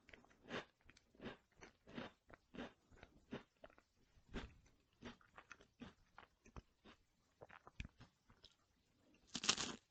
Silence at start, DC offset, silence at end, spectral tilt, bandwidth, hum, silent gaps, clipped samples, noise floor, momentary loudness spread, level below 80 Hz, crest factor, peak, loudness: 0.1 s; under 0.1%; 0.1 s; -2 dB/octave; 8.8 kHz; none; none; under 0.1%; -80 dBFS; 24 LU; -68 dBFS; 40 dB; -16 dBFS; -50 LUFS